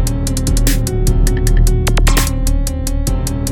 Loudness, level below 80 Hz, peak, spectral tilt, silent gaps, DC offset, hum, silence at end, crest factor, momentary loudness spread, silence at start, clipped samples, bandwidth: -16 LUFS; -14 dBFS; 0 dBFS; -5 dB/octave; none; under 0.1%; none; 0 s; 12 dB; 5 LU; 0 s; under 0.1%; 19 kHz